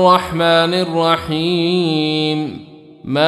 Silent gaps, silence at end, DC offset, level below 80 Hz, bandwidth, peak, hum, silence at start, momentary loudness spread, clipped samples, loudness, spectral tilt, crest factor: none; 0 s; under 0.1%; -48 dBFS; 13.5 kHz; -2 dBFS; none; 0 s; 11 LU; under 0.1%; -16 LUFS; -6 dB/octave; 14 dB